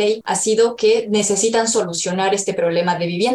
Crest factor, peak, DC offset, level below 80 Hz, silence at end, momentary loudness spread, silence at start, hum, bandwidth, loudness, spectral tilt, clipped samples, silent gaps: 12 dB; -6 dBFS; under 0.1%; -60 dBFS; 0 s; 4 LU; 0 s; none; 12.5 kHz; -17 LUFS; -3 dB/octave; under 0.1%; none